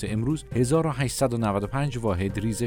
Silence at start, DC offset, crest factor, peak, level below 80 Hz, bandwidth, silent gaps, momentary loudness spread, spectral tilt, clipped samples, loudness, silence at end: 0 s; under 0.1%; 14 dB; -10 dBFS; -44 dBFS; 17.5 kHz; none; 4 LU; -6 dB/octave; under 0.1%; -26 LUFS; 0 s